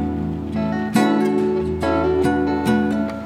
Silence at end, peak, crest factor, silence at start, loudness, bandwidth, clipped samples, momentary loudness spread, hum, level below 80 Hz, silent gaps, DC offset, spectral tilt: 0 s; -6 dBFS; 14 dB; 0 s; -20 LUFS; 15 kHz; under 0.1%; 6 LU; none; -38 dBFS; none; under 0.1%; -7 dB/octave